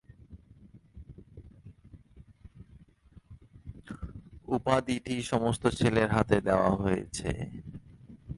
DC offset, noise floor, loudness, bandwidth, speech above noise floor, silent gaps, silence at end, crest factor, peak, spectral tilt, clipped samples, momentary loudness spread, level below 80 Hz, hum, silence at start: under 0.1%; -57 dBFS; -29 LUFS; 11.5 kHz; 29 dB; none; 0 s; 22 dB; -10 dBFS; -6 dB/octave; under 0.1%; 25 LU; -50 dBFS; none; 0.3 s